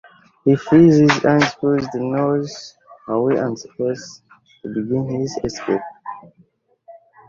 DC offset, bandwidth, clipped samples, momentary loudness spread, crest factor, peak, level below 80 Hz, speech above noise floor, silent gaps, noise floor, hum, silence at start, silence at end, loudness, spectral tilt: under 0.1%; 7.6 kHz; under 0.1%; 23 LU; 18 dB; 0 dBFS; -52 dBFS; 40 dB; none; -57 dBFS; none; 0.45 s; 0.35 s; -18 LUFS; -6.5 dB/octave